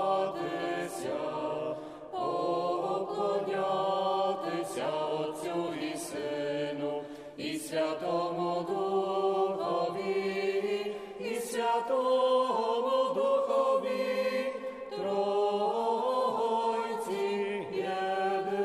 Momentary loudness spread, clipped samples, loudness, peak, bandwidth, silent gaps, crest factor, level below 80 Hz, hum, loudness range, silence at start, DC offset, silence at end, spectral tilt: 8 LU; under 0.1%; -31 LUFS; -18 dBFS; 15.5 kHz; none; 14 dB; -76 dBFS; none; 5 LU; 0 s; under 0.1%; 0 s; -4.5 dB/octave